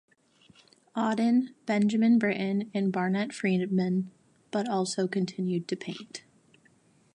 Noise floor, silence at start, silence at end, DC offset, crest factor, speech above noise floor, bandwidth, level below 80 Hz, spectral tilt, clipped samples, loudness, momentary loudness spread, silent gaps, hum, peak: -63 dBFS; 0.95 s; 0.95 s; under 0.1%; 16 dB; 36 dB; 11 kHz; -76 dBFS; -6 dB/octave; under 0.1%; -28 LUFS; 13 LU; none; none; -14 dBFS